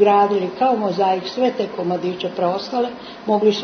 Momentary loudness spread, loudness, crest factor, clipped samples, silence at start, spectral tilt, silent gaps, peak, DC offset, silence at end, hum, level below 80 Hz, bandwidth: 7 LU; -20 LUFS; 16 dB; under 0.1%; 0 s; -6 dB/octave; none; -2 dBFS; under 0.1%; 0 s; none; -64 dBFS; 6.6 kHz